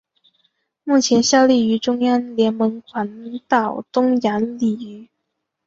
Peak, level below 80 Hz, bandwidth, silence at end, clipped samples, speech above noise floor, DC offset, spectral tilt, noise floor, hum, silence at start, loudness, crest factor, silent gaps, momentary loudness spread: -2 dBFS; -62 dBFS; 7.8 kHz; 0.65 s; under 0.1%; 59 dB; under 0.1%; -4 dB/octave; -77 dBFS; none; 0.85 s; -18 LUFS; 18 dB; none; 14 LU